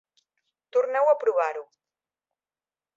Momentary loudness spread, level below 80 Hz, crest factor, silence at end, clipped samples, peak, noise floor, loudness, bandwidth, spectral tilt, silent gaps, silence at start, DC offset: 8 LU; -88 dBFS; 18 dB; 1.35 s; under 0.1%; -10 dBFS; under -90 dBFS; -24 LUFS; 7.6 kHz; -2 dB/octave; none; 0.75 s; under 0.1%